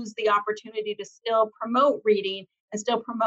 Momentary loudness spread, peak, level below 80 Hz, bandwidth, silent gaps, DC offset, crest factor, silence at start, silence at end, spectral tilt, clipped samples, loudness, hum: 12 LU; -10 dBFS; -76 dBFS; 8 kHz; 2.60-2.68 s; under 0.1%; 16 dB; 0 s; 0 s; -3.5 dB/octave; under 0.1%; -25 LUFS; none